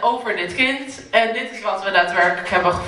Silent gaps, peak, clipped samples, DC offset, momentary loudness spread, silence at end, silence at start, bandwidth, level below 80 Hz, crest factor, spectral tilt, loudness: none; 0 dBFS; under 0.1%; under 0.1%; 7 LU; 0 s; 0 s; 11.5 kHz; -50 dBFS; 18 dB; -4 dB/octave; -19 LUFS